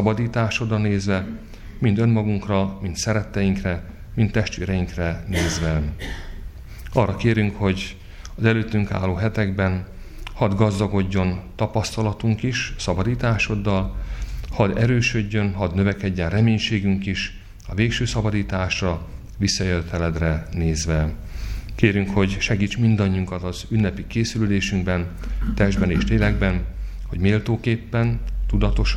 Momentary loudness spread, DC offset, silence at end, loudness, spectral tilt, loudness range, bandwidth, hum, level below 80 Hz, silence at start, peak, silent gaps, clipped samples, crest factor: 12 LU; under 0.1%; 0 s; -22 LUFS; -6 dB/octave; 2 LU; 12.5 kHz; none; -32 dBFS; 0 s; -2 dBFS; none; under 0.1%; 20 dB